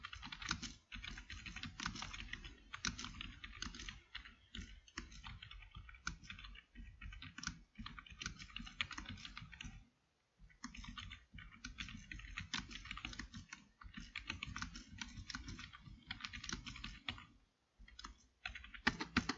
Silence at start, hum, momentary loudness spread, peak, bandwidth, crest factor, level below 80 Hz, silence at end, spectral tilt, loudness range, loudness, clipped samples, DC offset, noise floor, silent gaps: 0 s; none; 12 LU; -16 dBFS; 7.6 kHz; 34 dB; -58 dBFS; 0 s; -2 dB/octave; 5 LU; -49 LUFS; under 0.1%; under 0.1%; -80 dBFS; none